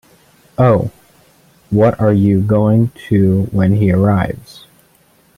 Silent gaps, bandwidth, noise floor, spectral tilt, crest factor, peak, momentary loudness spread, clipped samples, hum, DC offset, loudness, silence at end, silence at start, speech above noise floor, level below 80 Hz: none; 12 kHz; -52 dBFS; -9.5 dB/octave; 14 dB; -2 dBFS; 8 LU; under 0.1%; none; under 0.1%; -14 LUFS; 1 s; 0.6 s; 40 dB; -44 dBFS